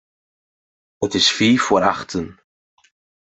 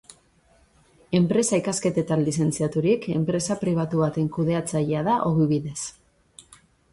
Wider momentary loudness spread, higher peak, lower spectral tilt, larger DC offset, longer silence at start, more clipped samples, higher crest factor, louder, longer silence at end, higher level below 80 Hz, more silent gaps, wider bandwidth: first, 13 LU vs 4 LU; first, -2 dBFS vs -8 dBFS; second, -3.5 dB/octave vs -6 dB/octave; neither; about the same, 1 s vs 1.1 s; neither; about the same, 20 dB vs 16 dB; first, -17 LUFS vs -24 LUFS; first, 0.95 s vs 0.5 s; about the same, -58 dBFS vs -56 dBFS; neither; second, 8.4 kHz vs 11.5 kHz